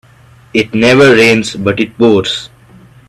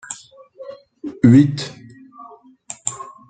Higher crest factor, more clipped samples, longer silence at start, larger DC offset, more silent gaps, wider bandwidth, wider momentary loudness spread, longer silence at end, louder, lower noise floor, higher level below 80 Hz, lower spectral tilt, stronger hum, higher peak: second, 12 dB vs 18 dB; first, 0.1% vs under 0.1%; first, 0.55 s vs 0.1 s; neither; neither; first, 13.5 kHz vs 9.4 kHz; second, 11 LU vs 26 LU; first, 0.65 s vs 0.25 s; first, -10 LUFS vs -16 LUFS; about the same, -41 dBFS vs -43 dBFS; first, -46 dBFS vs -54 dBFS; about the same, -5 dB/octave vs -6 dB/octave; neither; about the same, 0 dBFS vs -2 dBFS